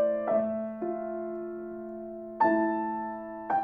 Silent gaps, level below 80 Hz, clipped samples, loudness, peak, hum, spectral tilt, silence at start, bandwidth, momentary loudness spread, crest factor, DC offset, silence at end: none; -68 dBFS; under 0.1%; -31 LUFS; -12 dBFS; none; -9.5 dB/octave; 0 s; 4.8 kHz; 14 LU; 18 dB; under 0.1%; 0 s